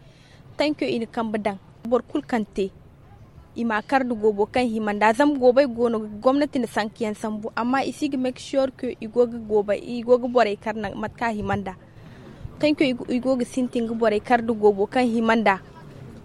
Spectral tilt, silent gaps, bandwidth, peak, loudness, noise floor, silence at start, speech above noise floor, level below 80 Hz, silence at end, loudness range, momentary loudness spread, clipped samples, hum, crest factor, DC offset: -5.5 dB/octave; none; 12 kHz; -4 dBFS; -23 LUFS; -48 dBFS; 0.5 s; 26 dB; -52 dBFS; 0 s; 5 LU; 10 LU; under 0.1%; none; 18 dB; under 0.1%